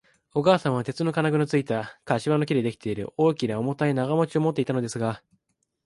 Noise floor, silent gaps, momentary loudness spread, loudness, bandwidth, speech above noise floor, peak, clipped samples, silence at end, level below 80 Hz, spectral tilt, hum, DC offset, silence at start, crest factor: -75 dBFS; none; 8 LU; -25 LUFS; 11.5 kHz; 51 dB; -6 dBFS; under 0.1%; 0.7 s; -62 dBFS; -7 dB/octave; none; under 0.1%; 0.35 s; 20 dB